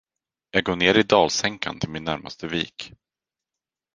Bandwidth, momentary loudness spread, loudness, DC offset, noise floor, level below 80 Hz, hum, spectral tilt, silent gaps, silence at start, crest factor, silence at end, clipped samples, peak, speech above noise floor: 10.5 kHz; 13 LU; -22 LUFS; under 0.1%; -89 dBFS; -52 dBFS; none; -3.5 dB/octave; none; 0.55 s; 24 dB; 1.05 s; under 0.1%; -2 dBFS; 66 dB